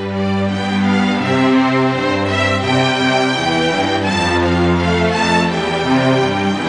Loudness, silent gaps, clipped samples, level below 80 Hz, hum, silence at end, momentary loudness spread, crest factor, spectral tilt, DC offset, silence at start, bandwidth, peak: -15 LUFS; none; under 0.1%; -40 dBFS; none; 0 s; 3 LU; 14 dB; -5.5 dB/octave; under 0.1%; 0 s; 10 kHz; -2 dBFS